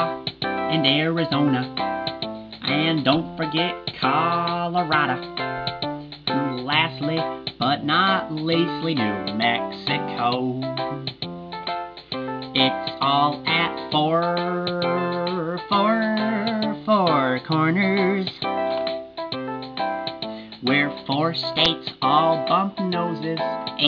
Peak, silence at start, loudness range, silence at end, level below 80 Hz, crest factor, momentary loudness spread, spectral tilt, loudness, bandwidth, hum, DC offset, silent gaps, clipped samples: -4 dBFS; 0 s; 3 LU; 0 s; -58 dBFS; 20 dB; 10 LU; -7 dB/octave; -23 LUFS; 5.4 kHz; none; under 0.1%; none; under 0.1%